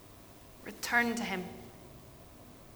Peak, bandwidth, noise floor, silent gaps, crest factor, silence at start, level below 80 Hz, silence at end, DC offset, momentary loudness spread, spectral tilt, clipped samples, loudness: -14 dBFS; over 20 kHz; -54 dBFS; none; 24 dB; 0 s; -62 dBFS; 0 s; under 0.1%; 24 LU; -3.5 dB/octave; under 0.1%; -33 LUFS